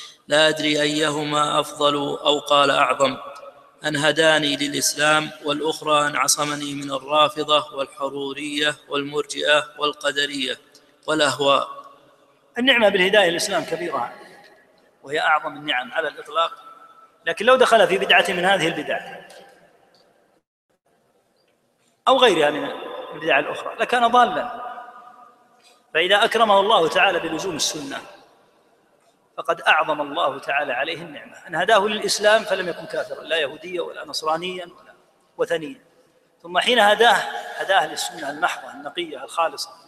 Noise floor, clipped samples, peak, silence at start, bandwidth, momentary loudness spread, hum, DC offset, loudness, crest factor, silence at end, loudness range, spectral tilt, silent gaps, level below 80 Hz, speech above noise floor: -65 dBFS; under 0.1%; -2 dBFS; 0 s; 15 kHz; 14 LU; none; under 0.1%; -20 LUFS; 20 dB; 0.15 s; 5 LU; -2.5 dB/octave; 20.47-20.69 s; -66 dBFS; 44 dB